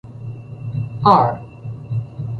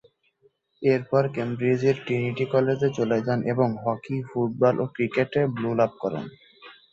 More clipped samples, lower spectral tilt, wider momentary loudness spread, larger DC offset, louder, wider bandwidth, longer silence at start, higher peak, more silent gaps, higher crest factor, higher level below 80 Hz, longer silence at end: neither; about the same, -9 dB/octave vs -8 dB/octave; first, 20 LU vs 7 LU; neither; first, -18 LUFS vs -25 LUFS; second, 6.6 kHz vs 7.6 kHz; second, 0.05 s vs 0.8 s; first, -2 dBFS vs -8 dBFS; neither; about the same, 18 dB vs 18 dB; first, -48 dBFS vs -64 dBFS; second, 0 s vs 0.2 s